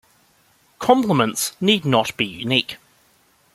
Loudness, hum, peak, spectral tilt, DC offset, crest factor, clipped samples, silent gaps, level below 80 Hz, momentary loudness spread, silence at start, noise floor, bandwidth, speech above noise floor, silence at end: -19 LUFS; none; -2 dBFS; -4 dB/octave; under 0.1%; 20 dB; under 0.1%; none; -60 dBFS; 9 LU; 0.8 s; -59 dBFS; 15.5 kHz; 40 dB; 0.8 s